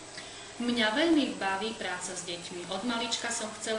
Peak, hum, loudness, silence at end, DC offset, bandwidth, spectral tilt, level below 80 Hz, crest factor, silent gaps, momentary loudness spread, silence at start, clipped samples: -14 dBFS; none; -30 LUFS; 0 s; under 0.1%; 10.5 kHz; -2.5 dB/octave; -66 dBFS; 18 dB; none; 12 LU; 0 s; under 0.1%